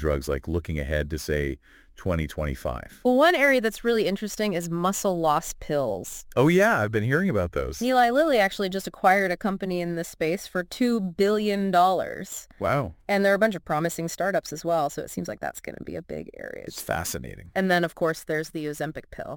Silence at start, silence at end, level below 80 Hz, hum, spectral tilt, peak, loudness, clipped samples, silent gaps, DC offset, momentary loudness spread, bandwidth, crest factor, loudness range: 0 s; 0 s; -44 dBFS; none; -5 dB/octave; -6 dBFS; -25 LUFS; under 0.1%; none; under 0.1%; 13 LU; 17 kHz; 18 dB; 6 LU